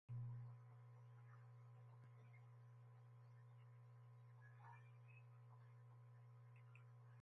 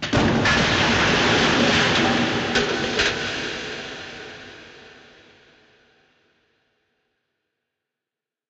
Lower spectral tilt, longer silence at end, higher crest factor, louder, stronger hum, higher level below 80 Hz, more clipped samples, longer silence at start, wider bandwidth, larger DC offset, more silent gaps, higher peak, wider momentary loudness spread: first, -8 dB/octave vs -4 dB/octave; second, 0 s vs 3.6 s; about the same, 16 dB vs 18 dB; second, -64 LUFS vs -19 LUFS; neither; second, under -90 dBFS vs -44 dBFS; neither; about the same, 0.1 s vs 0 s; second, 6 kHz vs 8.4 kHz; neither; neither; second, -46 dBFS vs -6 dBFS; second, 7 LU vs 18 LU